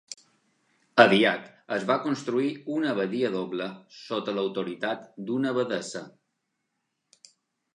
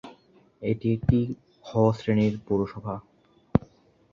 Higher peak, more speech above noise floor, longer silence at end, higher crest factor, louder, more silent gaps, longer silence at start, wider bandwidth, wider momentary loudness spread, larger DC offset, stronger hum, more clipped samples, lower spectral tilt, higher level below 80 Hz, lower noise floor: first, -2 dBFS vs -6 dBFS; first, 53 dB vs 32 dB; first, 1.65 s vs 0.55 s; about the same, 26 dB vs 22 dB; about the same, -26 LUFS vs -26 LUFS; neither; about the same, 0.1 s vs 0.05 s; first, 11 kHz vs 7.4 kHz; first, 17 LU vs 12 LU; neither; neither; neither; second, -5 dB/octave vs -9 dB/octave; second, -80 dBFS vs -46 dBFS; first, -80 dBFS vs -56 dBFS